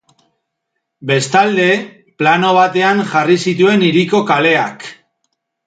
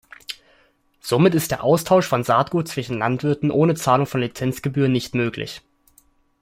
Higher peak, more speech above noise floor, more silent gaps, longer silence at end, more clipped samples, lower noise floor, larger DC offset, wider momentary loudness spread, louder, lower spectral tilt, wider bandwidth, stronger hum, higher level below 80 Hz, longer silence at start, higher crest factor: about the same, 0 dBFS vs -2 dBFS; first, 61 dB vs 40 dB; neither; about the same, 0.75 s vs 0.8 s; neither; first, -74 dBFS vs -59 dBFS; neither; second, 11 LU vs 17 LU; first, -13 LUFS vs -20 LUFS; about the same, -5 dB/octave vs -6 dB/octave; second, 9.4 kHz vs 16.5 kHz; neither; second, -60 dBFS vs -54 dBFS; first, 1 s vs 0.3 s; about the same, 14 dB vs 18 dB